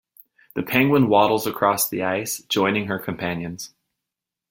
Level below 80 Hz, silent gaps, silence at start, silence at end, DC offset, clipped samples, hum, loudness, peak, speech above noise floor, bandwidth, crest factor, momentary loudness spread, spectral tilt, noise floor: -60 dBFS; none; 0.55 s; 0.85 s; under 0.1%; under 0.1%; none; -21 LUFS; -2 dBFS; 65 dB; 17 kHz; 20 dB; 15 LU; -4.5 dB/octave; -86 dBFS